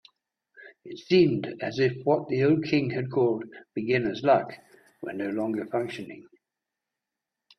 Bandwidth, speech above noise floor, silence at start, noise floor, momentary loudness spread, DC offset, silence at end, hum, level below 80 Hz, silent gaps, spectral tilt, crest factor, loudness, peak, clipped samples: 8.4 kHz; 61 dB; 0.6 s; -87 dBFS; 16 LU; under 0.1%; 1.35 s; none; -66 dBFS; none; -7.5 dB/octave; 18 dB; -26 LUFS; -8 dBFS; under 0.1%